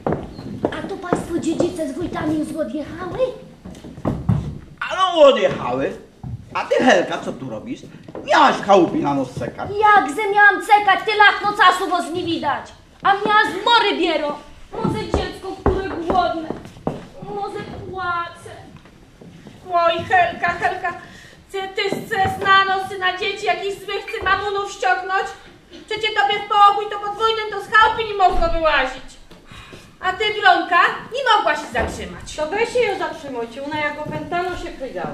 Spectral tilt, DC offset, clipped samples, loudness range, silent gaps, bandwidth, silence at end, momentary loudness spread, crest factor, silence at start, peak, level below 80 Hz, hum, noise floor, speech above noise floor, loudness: -4.5 dB/octave; under 0.1%; under 0.1%; 9 LU; none; 14.5 kHz; 0 s; 16 LU; 18 dB; 0 s; -2 dBFS; -38 dBFS; none; -44 dBFS; 26 dB; -19 LUFS